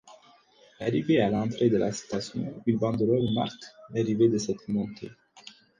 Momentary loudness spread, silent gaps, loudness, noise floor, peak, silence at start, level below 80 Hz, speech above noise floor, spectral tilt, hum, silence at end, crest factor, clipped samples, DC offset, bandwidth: 11 LU; none; -27 LUFS; -58 dBFS; -10 dBFS; 0.05 s; -60 dBFS; 32 dB; -6.5 dB/octave; none; 0.3 s; 18 dB; under 0.1%; under 0.1%; 9.6 kHz